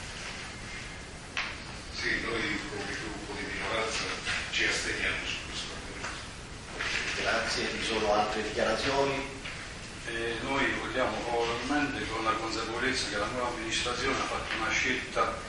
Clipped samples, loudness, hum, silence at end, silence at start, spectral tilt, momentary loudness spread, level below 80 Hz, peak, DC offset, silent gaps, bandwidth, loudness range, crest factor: under 0.1%; -31 LUFS; none; 0 s; 0 s; -3 dB/octave; 11 LU; -48 dBFS; -14 dBFS; under 0.1%; none; 11.5 kHz; 3 LU; 18 dB